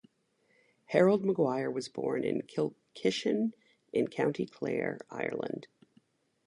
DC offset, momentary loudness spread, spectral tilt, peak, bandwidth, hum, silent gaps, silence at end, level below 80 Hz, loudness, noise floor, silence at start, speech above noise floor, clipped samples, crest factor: under 0.1%; 10 LU; -6 dB/octave; -10 dBFS; 11 kHz; none; none; 0.8 s; -76 dBFS; -32 LUFS; -73 dBFS; 0.9 s; 42 dB; under 0.1%; 24 dB